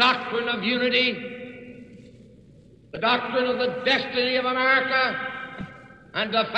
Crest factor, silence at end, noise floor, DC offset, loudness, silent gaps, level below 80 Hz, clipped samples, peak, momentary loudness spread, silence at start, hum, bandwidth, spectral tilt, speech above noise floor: 18 dB; 0 s; -51 dBFS; under 0.1%; -23 LUFS; none; -62 dBFS; under 0.1%; -8 dBFS; 19 LU; 0 s; none; 8.4 kHz; -4.5 dB/octave; 28 dB